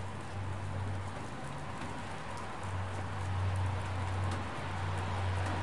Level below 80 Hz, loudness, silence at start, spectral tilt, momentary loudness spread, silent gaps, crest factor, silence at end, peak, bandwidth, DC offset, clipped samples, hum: -54 dBFS; -38 LUFS; 0 s; -6 dB/octave; 7 LU; none; 12 dB; 0 s; -24 dBFS; 11.5 kHz; 0.6%; under 0.1%; none